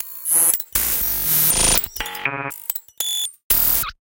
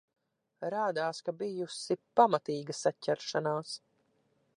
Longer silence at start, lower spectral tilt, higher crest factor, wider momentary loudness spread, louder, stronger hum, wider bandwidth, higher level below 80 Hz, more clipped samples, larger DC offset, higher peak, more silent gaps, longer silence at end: second, 0 s vs 0.6 s; second, -0.5 dB/octave vs -4.5 dB/octave; about the same, 20 dB vs 22 dB; about the same, 11 LU vs 11 LU; first, -17 LUFS vs -33 LUFS; neither; first, 18 kHz vs 11 kHz; first, -38 dBFS vs -86 dBFS; neither; neither; first, 0 dBFS vs -10 dBFS; first, 3.44-3.50 s vs none; second, 0.1 s vs 0.8 s